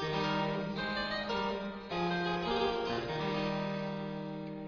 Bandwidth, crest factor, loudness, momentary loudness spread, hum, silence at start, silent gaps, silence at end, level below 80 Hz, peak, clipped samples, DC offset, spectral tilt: 7.2 kHz; 16 dB; -35 LUFS; 7 LU; none; 0 s; none; 0 s; -58 dBFS; -20 dBFS; under 0.1%; under 0.1%; -3.5 dB/octave